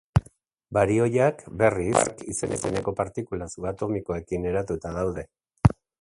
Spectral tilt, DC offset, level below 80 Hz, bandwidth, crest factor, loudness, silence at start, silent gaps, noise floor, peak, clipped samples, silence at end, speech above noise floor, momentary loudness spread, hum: -6 dB/octave; under 0.1%; -42 dBFS; 11.5 kHz; 24 dB; -26 LUFS; 0.15 s; none; -57 dBFS; -2 dBFS; under 0.1%; 0.3 s; 32 dB; 10 LU; none